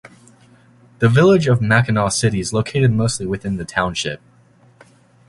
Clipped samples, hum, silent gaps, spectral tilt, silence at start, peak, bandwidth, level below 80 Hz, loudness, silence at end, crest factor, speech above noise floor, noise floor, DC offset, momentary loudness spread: under 0.1%; none; none; -5.5 dB/octave; 0.05 s; -2 dBFS; 11.5 kHz; -44 dBFS; -17 LUFS; 1.1 s; 18 dB; 35 dB; -51 dBFS; under 0.1%; 11 LU